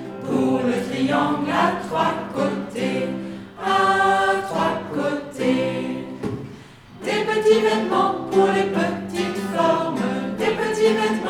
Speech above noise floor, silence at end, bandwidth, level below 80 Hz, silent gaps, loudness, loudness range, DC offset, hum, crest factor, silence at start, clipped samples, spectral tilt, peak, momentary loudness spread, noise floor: 22 dB; 0 s; 16 kHz; -56 dBFS; none; -21 LUFS; 3 LU; under 0.1%; none; 16 dB; 0 s; under 0.1%; -5.5 dB/octave; -4 dBFS; 11 LU; -42 dBFS